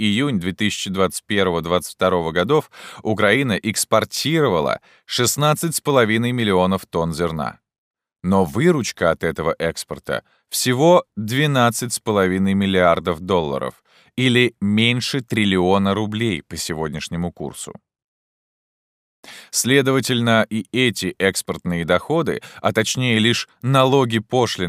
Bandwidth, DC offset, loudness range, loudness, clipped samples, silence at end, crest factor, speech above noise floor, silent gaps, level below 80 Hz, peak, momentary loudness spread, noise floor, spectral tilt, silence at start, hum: 16 kHz; under 0.1%; 4 LU; -19 LUFS; under 0.1%; 0 s; 18 dB; over 71 dB; 7.78-7.91 s, 18.04-19.23 s; -50 dBFS; -2 dBFS; 9 LU; under -90 dBFS; -4.5 dB/octave; 0 s; none